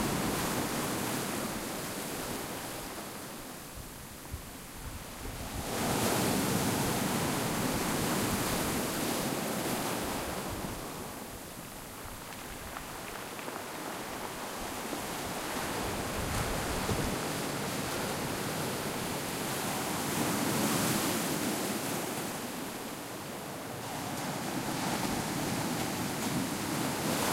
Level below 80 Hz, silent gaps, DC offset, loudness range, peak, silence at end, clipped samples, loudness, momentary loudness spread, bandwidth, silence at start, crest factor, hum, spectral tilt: -52 dBFS; none; under 0.1%; 9 LU; -18 dBFS; 0 s; under 0.1%; -34 LUFS; 12 LU; 16 kHz; 0 s; 16 dB; none; -3.5 dB/octave